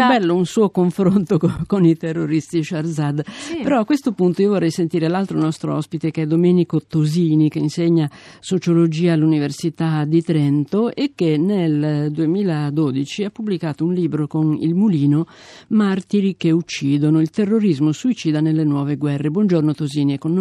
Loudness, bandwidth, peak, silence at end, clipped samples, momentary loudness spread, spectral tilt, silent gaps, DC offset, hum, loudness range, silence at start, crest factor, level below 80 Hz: -18 LUFS; 12 kHz; -4 dBFS; 0 s; under 0.1%; 6 LU; -7.5 dB/octave; none; under 0.1%; none; 2 LU; 0 s; 14 dB; -56 dBFS